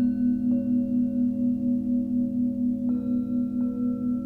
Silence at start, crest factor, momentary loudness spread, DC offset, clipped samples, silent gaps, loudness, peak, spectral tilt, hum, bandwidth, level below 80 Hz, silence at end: 0 s; 10 dB; 3 LU; under 0.1%; under 0.1%; none; -26 LUFS; -16 dBFS; -11.5 dB/octave; none; 1.6 kHz; -54 dBFS; 0 s